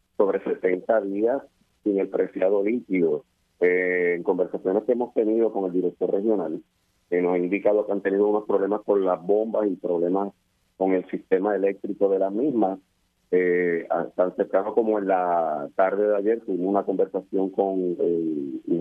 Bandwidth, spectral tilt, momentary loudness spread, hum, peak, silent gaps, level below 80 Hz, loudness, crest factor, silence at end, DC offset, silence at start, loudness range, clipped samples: 3.7 kHz; -9.5 dB/octave; 5 LU; none; -6 dBFS; none; -72 dBFS; -24 LUFS; 18 dB; 0 s; under 0.1%; 0.2 s; 1 LU; under 0.1%